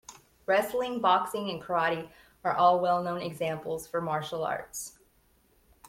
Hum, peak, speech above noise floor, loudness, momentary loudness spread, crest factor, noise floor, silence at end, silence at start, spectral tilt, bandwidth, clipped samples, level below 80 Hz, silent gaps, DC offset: none; -10 dBFS; 37 dB; -29 LUFS; 13 LU; 20 dB; -66 dBFS; 1 s; 0.1 s; -4.5 dB/octave; 16.5 kHz; under 0.1%; -66 dBFS; none; under 0.1%